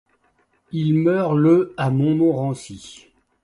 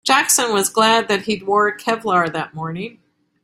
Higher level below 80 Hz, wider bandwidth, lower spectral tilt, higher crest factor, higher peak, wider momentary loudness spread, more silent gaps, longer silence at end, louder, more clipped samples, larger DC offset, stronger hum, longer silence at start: about the same, -58 dBFS vs -62 dBFS; second, 11 kHz vs 16 kHz; first, -8 dB/octave vs -2 dB/octave; about the same, 16 dB vs 18 dB; about the same, -4 dBFS vs -2 dBFS; first, 16 LU vs 13 LU; neither; about the same, 0.5 s vs 0.55 s; about the same, -19 LUFS vs -17 LUFS; neither; neither; neither; first, 0.75 s vs 0.05 s